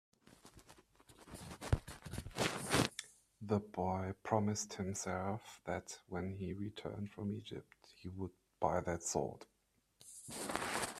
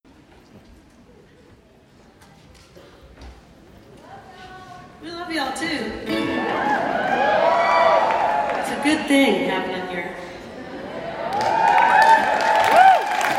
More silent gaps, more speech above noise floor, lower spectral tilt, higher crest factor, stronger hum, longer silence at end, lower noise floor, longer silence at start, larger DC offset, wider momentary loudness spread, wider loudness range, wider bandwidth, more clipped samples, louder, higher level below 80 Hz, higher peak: neither; about the same, 29 dB vs 31 dB; about the same, -4.5 dB/octave vs -4 dB/octave; first, 26 dB vs 20 dB; neither; about the same, 0 s vs 0 s; first, -70 dBFS vs -51 dBFS; second, 0.3 s vs 0.55 s; neither; second, 17 LU vs 21 LU; second, 5 LU vs 13 LU; second, 14.5 kHz vs 16 kHz; neither; second, -41 LUFS vs -18 LUFS; about the same, -58 dBFS vs -54 dBFS; second, -16 dBFS vs -2 dBFS